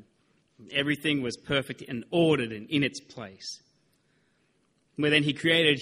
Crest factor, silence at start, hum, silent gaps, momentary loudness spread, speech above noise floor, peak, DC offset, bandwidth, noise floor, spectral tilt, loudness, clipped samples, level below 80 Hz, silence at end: 22 dB; 0.6 s; none; none; 17 LU; 43 dB; -6 dBFS; under 0.1%; 14.5 kHz; -70 dBFS; -5 dB/octave; -27 LUFS; under 0.1%; -64 dBFS; 0 s